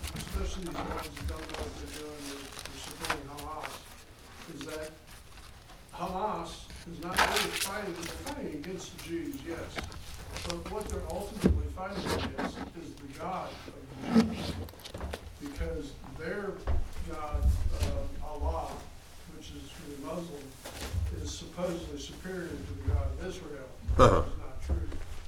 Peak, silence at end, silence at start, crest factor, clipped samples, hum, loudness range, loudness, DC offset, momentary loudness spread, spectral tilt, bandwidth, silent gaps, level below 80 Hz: -6 dBFS; 0 s; 0 s; 28 dB; under 0.1%; none; 9 LU; -35 LUFS; under 0.1%; 16 LU; -5 dB/octave; 18 kHz; none; -40 dBFS